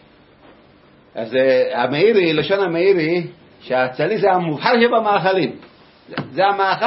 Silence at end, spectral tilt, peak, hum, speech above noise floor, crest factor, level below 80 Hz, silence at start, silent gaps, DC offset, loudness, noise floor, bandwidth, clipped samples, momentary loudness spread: 0 s; -10 dB/octave; 0 dBFS; none; 33 dB; 18 dB; -62 dBFS; 1.15 s; none; under 0.1%; -17 LUFS; -49 dBFS; 5.8 kHz; under 0.1%; 12 LU